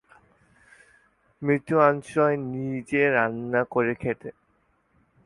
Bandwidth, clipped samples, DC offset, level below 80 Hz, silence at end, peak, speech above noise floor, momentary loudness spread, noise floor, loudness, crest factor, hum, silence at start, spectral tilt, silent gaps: 11.5 kHz; under 0.1%; under 0.1%; -62 dBFS; 0.95 s; -4 dBFS; 43 dB; 11 LU; -67 dBFS; -24 LUFS; 22 dB; none; 1.4 s; -7.5 dB/octave; none